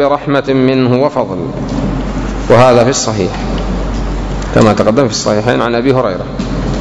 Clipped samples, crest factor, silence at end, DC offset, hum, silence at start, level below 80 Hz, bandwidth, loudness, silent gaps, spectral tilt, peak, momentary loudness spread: 1%; 12 dB; 0 s; under 0.1%; none; 0 s; -24 dBFS; 11 kHz; -12 LUFS; none; -5.5 dB/octave; 0 dBFS; 11 LU